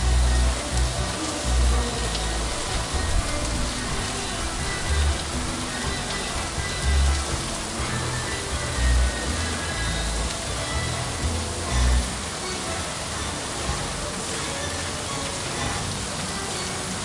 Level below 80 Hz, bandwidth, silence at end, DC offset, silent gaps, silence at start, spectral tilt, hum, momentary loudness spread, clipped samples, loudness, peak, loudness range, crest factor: -28 dBFS; 11.5 kHz; 0 s; under 0.1%; none; 0 s; -3.5 dB/octave; none; 5 LU; under 0.1%; -26 LUFS; -10 dBFS; 2 LU; 14 dB